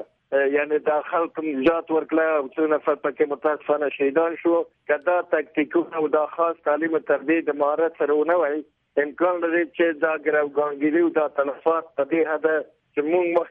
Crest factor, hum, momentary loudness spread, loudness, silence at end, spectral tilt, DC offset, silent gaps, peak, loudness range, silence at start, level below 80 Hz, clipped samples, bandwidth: 14 dB; none; 4 LU; -23 LUFS; 0 s; -8.5 dB/octave; under 0.1%; none; -8 dBFS; 1 LU; 0 s; -66 dBFS; under 0.1%; 4 kHz